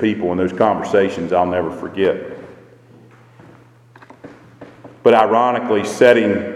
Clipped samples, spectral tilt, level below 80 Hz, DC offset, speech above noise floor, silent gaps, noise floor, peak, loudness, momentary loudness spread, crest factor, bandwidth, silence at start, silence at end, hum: under 0.1%; -6 dB/octave; -56 dBFS; under 0.1%; 30 dB; none; -46 dBFS; 0 dBFS; -16 LUFS; 10 LU; 18 dB; 12.5 kHz; 0 s; 0 s; none